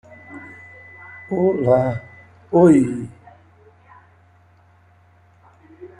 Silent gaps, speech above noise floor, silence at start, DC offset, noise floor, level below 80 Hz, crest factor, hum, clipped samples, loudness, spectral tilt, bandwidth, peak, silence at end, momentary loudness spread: none; 37 dB; 0.3 s; under 0.1%; -53 dBFS; -56 dBFS; 20 dB; none; under 0.1%; -18 LUFS; -9 dB/octave; 10.5 kHz; -2 dBFS; 0.15 s; 27 LU